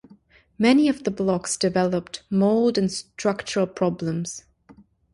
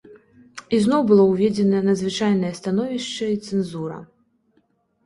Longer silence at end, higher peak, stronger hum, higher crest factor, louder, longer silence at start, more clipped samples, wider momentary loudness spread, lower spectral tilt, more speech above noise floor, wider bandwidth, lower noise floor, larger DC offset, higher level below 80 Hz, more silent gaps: second, 0.75 s vs 1 s; about the same, -6 dBFS vs -4 dBFS; neither; about the same, 18 dB vs 16 dB; second, -23 LUFS vs -20 LUFS; first, 0.6 s vs 0.1 s; neither; second, 9 LU vs 16 LU; second, -5 dB/octave vs -6.5 dB/octave; second, 32 dB vs 45 dB; about the same, 11.5 kHz vs 11.5 kHz; second, -54 dBFS vs -65 dBFS; neither; about the same, -58 dBFS vs -60 dBFS; neither